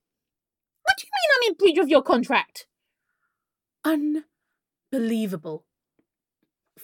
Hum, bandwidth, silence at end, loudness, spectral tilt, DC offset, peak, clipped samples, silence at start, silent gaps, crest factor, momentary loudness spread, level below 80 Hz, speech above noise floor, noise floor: none; 17.5 kHz; 0 s; -22 LUFS; -4 dB/octave; under 0.1%; -4 dBFS; under 0.1%; 0.85 s; none; 20 dB; 14 LU; -66 dBFS; 67 dB; -89 dBFS